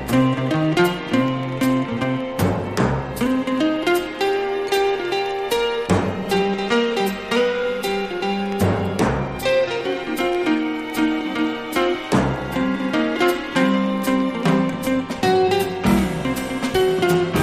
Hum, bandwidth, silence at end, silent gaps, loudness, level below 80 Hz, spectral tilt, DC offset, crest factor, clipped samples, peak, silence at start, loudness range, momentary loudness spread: none; 15.5 kHz; 0 s; none; -20 LUFS; -42 dBFS; -5.5 dB/octave; under 0.1%; 16 dB; under 0.1%; -4 dBFS; 0 s; 2 LU; 4 LU